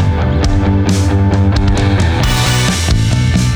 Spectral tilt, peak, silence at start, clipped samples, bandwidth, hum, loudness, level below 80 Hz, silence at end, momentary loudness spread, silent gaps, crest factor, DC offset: -5.5 dB/octave; 0 dBFS; 0 s; under 0.1%; over 20 kHz; none; -12 LUFS; -18 dBFS; 0 s; 1 LU; none; 10 dB; under 0.1%